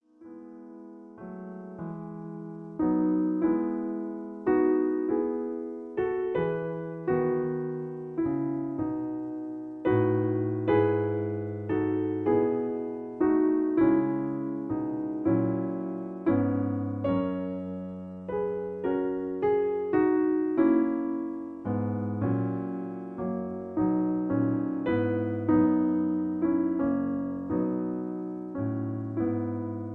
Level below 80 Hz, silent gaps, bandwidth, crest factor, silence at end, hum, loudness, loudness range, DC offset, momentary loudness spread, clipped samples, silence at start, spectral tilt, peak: -60 dBFS; none; 3.7 kHz; 16 dB; 0 s; none; -29 LUFS; 4 LU; under 0.1%; 12 LU; under 0.1%; 0.2 s; -11.5 dB/octave; -12 dBFS